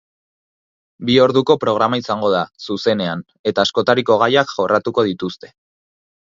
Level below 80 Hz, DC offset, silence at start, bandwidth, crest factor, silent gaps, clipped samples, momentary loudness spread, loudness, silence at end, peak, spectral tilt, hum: -58 dBFS; under 0.1%; 1 s; 7.6 kHz; 18 dB; 3.39-3.44 s; under 0.1%; 11 LU; -17 LUFS; 0.85 s; 0 dBFS; -5.5 dB/octave; none